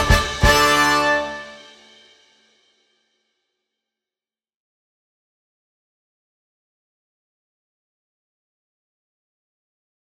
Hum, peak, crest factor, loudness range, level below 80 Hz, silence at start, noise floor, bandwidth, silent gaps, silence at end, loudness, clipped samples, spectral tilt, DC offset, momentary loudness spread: none; -2 dBFS; 24 dB; 17 LU; -34 dBFS; 0 s; under -90 dBFS; 16.5 kHz; none; 8.55 s; -16 LUFS; under 0.1%; -3.5 dB/octave; under 0.1%; 18 LU